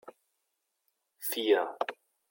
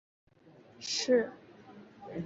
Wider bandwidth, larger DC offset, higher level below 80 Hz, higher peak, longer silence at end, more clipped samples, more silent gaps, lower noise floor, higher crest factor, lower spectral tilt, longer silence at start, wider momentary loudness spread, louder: first, 17 kHz vs 7.6 kHz; neither; second, under -90 dBFS vs -74 dBFS; about the same, -12 dBFS vs -14 dBFS; first, 0.35 s vs 0 s; neither; neither; first, -82 dBFS vs -59 dBFS; about the same, 22 dB vs 20 dB; second, -1.5 dB/octave vs -3 dB/octave; second, 0.05 s vs 0.8 s; second, 10 LU vs 26 LU; about the same, -31 LUFS vs -32 LUFS